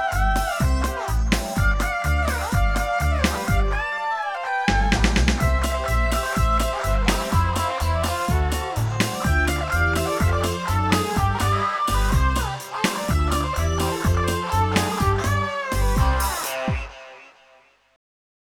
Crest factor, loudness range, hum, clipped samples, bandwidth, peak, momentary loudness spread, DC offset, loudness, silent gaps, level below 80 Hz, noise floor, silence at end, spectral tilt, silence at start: 18 dB; 1 LU; none; under 0.1%; 19 kHz; -4 dBFS; 4 LU; under 0.1%; -22 LUFS; none; -26 dBFS; -56 dBFS; 1.15 s; -5 dB/octave; 0 s